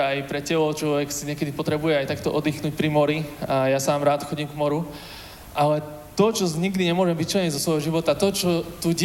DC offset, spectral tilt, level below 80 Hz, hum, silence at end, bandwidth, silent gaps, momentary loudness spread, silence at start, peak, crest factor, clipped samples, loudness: under 0.1%; -5 dB/octave; -52 dBFS; none; 0 s; 17 kHz; none; 7 LU; 0 s; -6 dBFS; 18 dB; under 0.1%; -23 LUFS